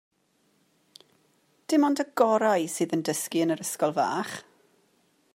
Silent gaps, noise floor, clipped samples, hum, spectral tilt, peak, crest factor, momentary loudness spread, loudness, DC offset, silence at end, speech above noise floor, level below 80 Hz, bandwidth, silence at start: none; -69 dBFS; under 0.1%; none; -4.5 dB/octave; -8 dBFS; 20 dB; 9 LU; -26 LUFS; under 0.1%; 0.95 s; 44 dB; -82 dBFS; 16 kHz; 1.7 s